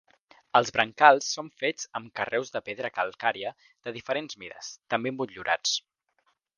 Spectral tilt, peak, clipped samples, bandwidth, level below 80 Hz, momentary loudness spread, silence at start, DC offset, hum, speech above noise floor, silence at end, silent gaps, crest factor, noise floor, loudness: -2.5 dB/octave; -2 dBFS; under 0.1%; 10 kHz; -70 dBFS; 19 LU; 0.55 s; under 0.1%; none; 45 dB; 0.8 s; none; 26 dB; -73 dBFS; -27 LUFS